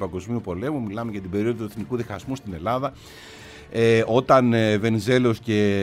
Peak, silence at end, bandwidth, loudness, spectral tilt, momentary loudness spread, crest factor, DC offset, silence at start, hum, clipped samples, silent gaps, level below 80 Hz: -4 dBFS; 0 s; 15 kHz; -23 LUFS; -6.5 dB/octave; 14 LU; 18 dB; under 0.1%; 0 s; none; under 0.1%; none; -52 dBFS